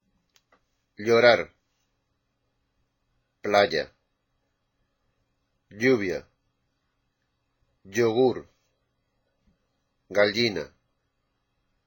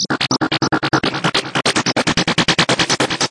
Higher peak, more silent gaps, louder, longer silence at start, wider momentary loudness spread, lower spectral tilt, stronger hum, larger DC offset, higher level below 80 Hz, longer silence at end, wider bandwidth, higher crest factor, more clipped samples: second, -6 dBFS vs -2 dBFS; neither; second, -23 LUFS vs -16 LUFS; first, 1 s vs 0 s; first, 18 LU vs 3 LU; first, -4.5 dB/octave vs -3 dB/octave; neither; neither; second, -66 dBFS vs -46 dBFS; first, 1.2 s vs 0 s; first, 17 kHz vs 11.5 kHz; first, 24 dB vs 16 dB; neither